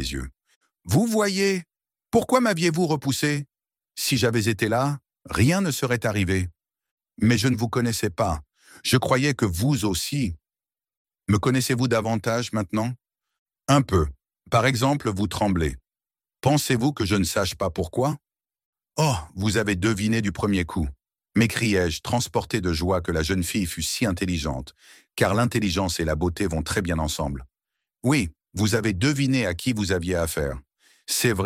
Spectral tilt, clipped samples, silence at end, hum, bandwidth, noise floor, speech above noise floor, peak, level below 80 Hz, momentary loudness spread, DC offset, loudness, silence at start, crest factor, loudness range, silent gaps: -5 dB/octave; under 0.1%; 0 s; none; 16.5 kHz; under -90 dBFS; over 67 dB; -4 dBFS; -42 dBFS; 10 LU; under 0.1%; -24 LUFS; 0 s; 20 dB; 2 LU; 0.56-0.61 s, 6.91-6.97 s, 10.97-11.05 s, 13.38-13.46 s, 18.65-18.73 s